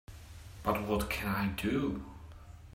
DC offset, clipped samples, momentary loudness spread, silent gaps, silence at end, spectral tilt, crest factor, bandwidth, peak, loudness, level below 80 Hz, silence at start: under 0.1%; under 0.1%; 19 LU; none; 0.05 s; -6 dB/octave; 18 dB; 16 kHz; -16 dBFS; -34 LUFS; -48 dBFS; 0.1 s